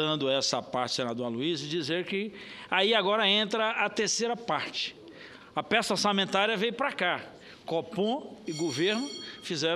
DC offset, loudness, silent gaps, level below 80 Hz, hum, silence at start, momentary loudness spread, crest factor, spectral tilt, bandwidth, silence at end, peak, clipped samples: under 0.1%; -29 LUFS; none; -72 dBFS; none; 0 s; 13 LU; 20 dB; -3 dB/octave; 14 kHz; 0 s; -10 dBFS; under 0.1%